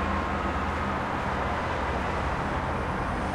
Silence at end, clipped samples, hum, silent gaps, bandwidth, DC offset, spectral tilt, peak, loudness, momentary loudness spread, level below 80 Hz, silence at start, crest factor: 0 s; under 0.1%; none; none; 12 kHz; under 0.1%; -6.5 dB/octave; -14 dBFS; -29 LUFS; 1 LU; -38 dBFS; 0 s; 14 dB